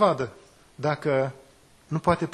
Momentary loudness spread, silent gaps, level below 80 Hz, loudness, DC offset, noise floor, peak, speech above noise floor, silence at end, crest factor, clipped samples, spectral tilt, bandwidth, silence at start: 8 LU; none; -54 dBFS; -27 LUFS; under 0.1%; -55 dBFS; -6 dBFS; 31 dB; 0 s; 20 dB; under 0.1%; -7 dB/octave; 12.5 kHz; 0 s